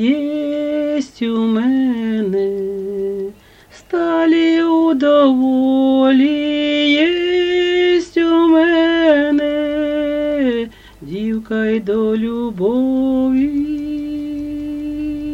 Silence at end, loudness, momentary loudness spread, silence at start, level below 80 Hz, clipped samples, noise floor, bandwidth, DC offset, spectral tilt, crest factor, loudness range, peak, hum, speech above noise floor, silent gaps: 0 s; -16 LUFS; 11 LU; 0 s; -46 dBFS; under 0.1%; -44 dBFS; 8 kHz; under 0.1%; -6 dB/octave; 14 dB; 5 LU; -2 dBFS; none; 29 dB; none